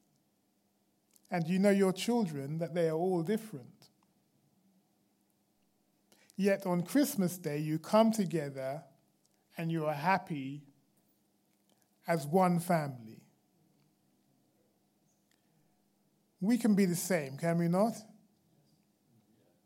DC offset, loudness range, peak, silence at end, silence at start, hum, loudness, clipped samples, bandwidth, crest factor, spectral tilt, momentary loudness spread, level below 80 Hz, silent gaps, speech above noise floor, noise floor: under 0.1%; 7 LU; -14 dBFS; 1.6 s; 1.3 s; none; -32 LUFS; under 0.1%; 16.5 kHz; 22 dB; -6 dB/octave; 14 LU; -86 dBFS; none; 44 dB; -75 dBFS